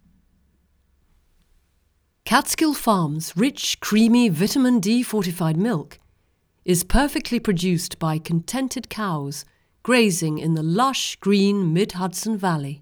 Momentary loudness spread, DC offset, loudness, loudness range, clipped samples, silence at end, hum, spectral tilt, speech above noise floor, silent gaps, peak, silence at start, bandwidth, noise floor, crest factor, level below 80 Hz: 9 LU; under 0.1%; -21 LUFS; 4 LU; under 0.1%; 0.05 s; none; -5 dB/octave; 45 dB; none; -2 dBFS; 2.25 s; over 20 kHz; -66 dBFS; 20 dB; -40 dBFS